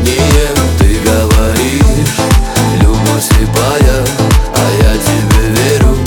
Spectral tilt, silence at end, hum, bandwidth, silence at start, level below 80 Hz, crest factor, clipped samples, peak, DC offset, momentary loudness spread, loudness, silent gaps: -5 dB/octave; 0 s; none; over 20 kHz; 0 s; -12 dBFS; 8 dB; under 0.1%; 0 dBFS; under 0.1%; 2 LU; -10 LUFS; none